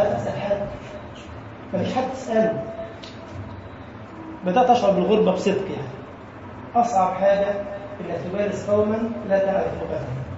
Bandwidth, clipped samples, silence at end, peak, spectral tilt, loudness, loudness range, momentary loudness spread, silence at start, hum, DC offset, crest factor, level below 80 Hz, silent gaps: 8 kHz; under 0.1%; 0 s; -4 dBFS; -6.5 dB/octave; -22 LUFS; 6 LU; 19 LU; 0 s; none; under 0.1%; 18 dB; -50 dBFS; none